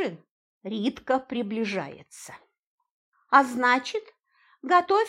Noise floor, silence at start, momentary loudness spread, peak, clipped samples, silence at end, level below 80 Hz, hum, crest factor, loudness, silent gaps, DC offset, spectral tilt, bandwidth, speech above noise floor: -64 dBFS; 0 s; 22 LU; -4 dBFS; under 0.1%; 0 s; -72 dBFS; none; 24 dB; -25 LUFS; 0.31-0.61 s, 2.59-2.78 s, 2.91-3.12 s; under 0.1%; -4.5 dB/octave; 15.5 kHz; 39 dB